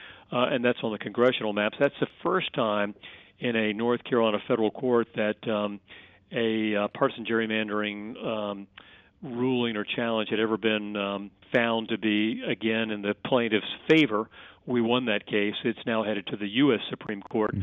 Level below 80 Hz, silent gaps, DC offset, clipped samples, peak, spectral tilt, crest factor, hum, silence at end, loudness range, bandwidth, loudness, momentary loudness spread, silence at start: -68 dBFS; none; under 0.1%; under 0.1%; -8 dBFS; -3.5 dB/octave; 18 dB; none; 0 s; 3 LU; 7 kHz; -27 LUFS; 9 LU; 0 s